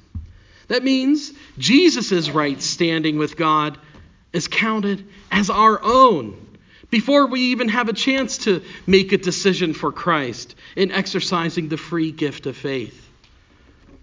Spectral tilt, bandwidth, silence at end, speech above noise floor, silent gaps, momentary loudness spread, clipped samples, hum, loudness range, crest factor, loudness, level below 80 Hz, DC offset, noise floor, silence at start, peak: -4.5 dB/octave; 7.6 kHz; 1.15 s; 33 dB; none; 12 LU; under 0.1%; none; 5 LU; 20 dB; -19 LUFS; -48 dBFS; under 0.1%; -52 dBFS; 0.15 s; 0 dBFS